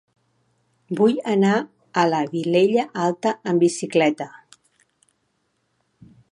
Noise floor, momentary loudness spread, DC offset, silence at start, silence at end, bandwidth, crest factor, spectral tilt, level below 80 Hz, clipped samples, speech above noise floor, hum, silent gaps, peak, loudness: -70 dBFS; 7 LU; under 0.1%; 0.9 s; 2.05 s; 11.5 kHz; 18 dB; -5.5 dB/octave; -72 dBFS; under 0.1%; 51 dB; none; none; -4 dBFS; -21 LUFS